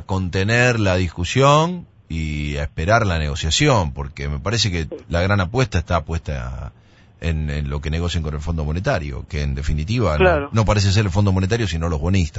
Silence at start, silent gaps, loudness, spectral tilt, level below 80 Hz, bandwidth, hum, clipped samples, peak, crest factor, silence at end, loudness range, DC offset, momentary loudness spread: 0 s; none; -20 LUFS; -5.5 dB/octave; -30 dBFS; 8 kHz; none; under 0.1%; 0 dBFS; 18 dB; 0 s; 6 LU; under 0.1%; 11 LU